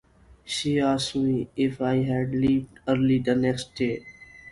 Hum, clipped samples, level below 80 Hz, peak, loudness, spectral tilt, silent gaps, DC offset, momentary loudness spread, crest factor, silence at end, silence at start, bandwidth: none; under 0.1%; -52 dBFS; -8 dBFS; -25 LUFS; -6 dB/octave; none; under 0.1%; 7 LU; 16 dB; 0 s; 0.45 s; 11.5 kHz